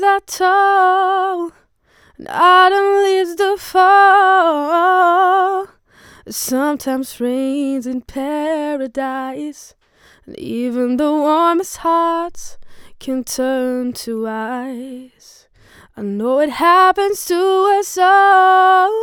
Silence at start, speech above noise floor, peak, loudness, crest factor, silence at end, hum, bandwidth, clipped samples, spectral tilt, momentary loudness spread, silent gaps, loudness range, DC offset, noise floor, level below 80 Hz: 0 s; 39 dB; 0 dBFS; -14 LUFS; 14 dB; 0 s; none; 19.5 kHz; under 0.1%; -3 dB/octave; 16 LU; none; 10 LU; under 0.1%; -53 dBFS; -54 dBFS